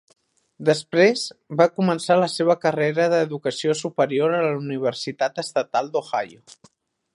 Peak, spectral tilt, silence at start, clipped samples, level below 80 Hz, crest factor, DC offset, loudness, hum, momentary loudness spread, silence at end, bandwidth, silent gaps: -2 dBFS; -5 dB/octave; 0.6 s; under 0.1%; -72 dBFS; 20 dB; under 0.1%; -22 LUFS; none; 7 LU; 0.9 s; 11.5 kHz; none